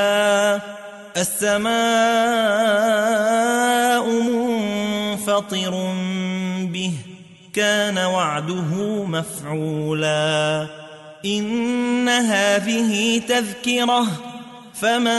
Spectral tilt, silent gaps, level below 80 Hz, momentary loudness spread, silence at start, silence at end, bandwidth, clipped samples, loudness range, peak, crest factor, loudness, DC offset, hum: -4 dB/octave; none; -64 dBFS; 10 LU; 0 s; 0 s; 12 kHz; under 0.1%; 5 LU; -6 dBFS; 14 dB; -20 LUFS; under 0.1%; none